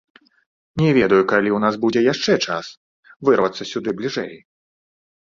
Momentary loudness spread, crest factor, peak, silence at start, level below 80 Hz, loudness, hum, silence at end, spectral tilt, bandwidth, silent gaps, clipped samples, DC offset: 12 LU; 18 dB; -2 dBFS; 0.75 s; -56 dBFS; -19 LUFS; none; 1 s; -5.5 dB/octave; 7.6 kHz; 2.77-3.03 s; under 0.1%; under 0.1%